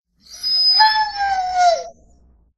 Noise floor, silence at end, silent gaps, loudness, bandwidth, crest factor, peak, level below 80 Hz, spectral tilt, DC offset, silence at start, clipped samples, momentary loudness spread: -53 dBFS; 0.65 s; none; -15 LUFS; 12.5 kHz; 18 dB; -2 dBFS; -52 dBFS; 1 dB/octave; under 0.1%; 0.3 s; under 0.1%; 11 LU